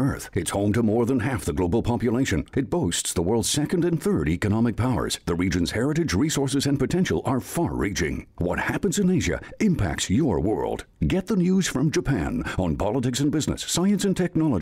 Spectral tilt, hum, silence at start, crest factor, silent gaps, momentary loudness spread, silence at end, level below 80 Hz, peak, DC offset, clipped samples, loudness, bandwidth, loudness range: -5.5 dB/octave; none; 0 s; 10 dB; none; 4 LU; 0 s; -40 dBFS; -12 dBFS; under 0.1%; under 0.1%; -24 LUFS; 16 kHz; 1 LU